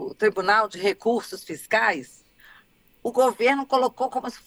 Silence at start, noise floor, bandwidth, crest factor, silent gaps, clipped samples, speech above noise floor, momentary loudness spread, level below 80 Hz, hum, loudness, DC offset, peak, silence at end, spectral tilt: 0 s; -57 dBFS; over 20 kHz; 18 dB; none; under 0.1%; 34 dB; 11 LU; -66 dBFS; none; -23 LUFS; under 0.1%; -6 dBFS; 0.1 s; -3.5 dB/octave